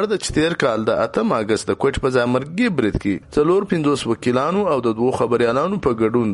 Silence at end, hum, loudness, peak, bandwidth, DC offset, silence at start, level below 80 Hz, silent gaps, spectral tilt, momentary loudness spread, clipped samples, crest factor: 0 s; none; -19 LUFS; -4 dBFS; 11.5 kHz; under 0.1%; 0 s; -42 dBFS; none; -6 dB/octave; 3 LU; under 0.1%; 14 dB